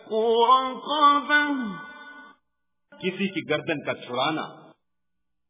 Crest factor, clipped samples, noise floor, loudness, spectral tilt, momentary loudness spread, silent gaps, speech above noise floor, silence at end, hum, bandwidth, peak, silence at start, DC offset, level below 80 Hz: 18 dB; under 0.1%; -84 dBFS; -23 LUFS; -8.5 dB/octave; 20 LU; none; 61 dB; 0.95 s; none; 3.9 kHz; -6 dBFS; 0.05 s; under 0.1%; -72 dBFS